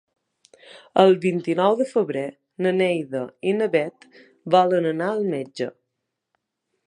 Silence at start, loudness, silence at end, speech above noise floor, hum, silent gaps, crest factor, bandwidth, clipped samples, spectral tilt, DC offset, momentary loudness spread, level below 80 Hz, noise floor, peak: 0.75 s; -22 LUFS; 1.15 s; 59 dB; none; none; 22 dB; 10.5 kHz; under 0.1%; -6.5 dB/octave; under 0.1%; 13 LU; -76 dBFS; -80 dBFS; -2 dBFS